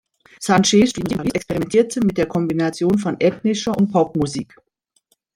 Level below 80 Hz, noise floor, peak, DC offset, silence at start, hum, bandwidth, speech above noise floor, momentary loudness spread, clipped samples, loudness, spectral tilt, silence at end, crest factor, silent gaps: -50 dBFS; -65 dBFS; -2 dBFS; under 0.1%; 0.4 s; none; 15 kHz; 47 dB; 8 LU; under 0.1%; -19 LUFS; -5 dB/octave; 0.9 s; 16 dB; none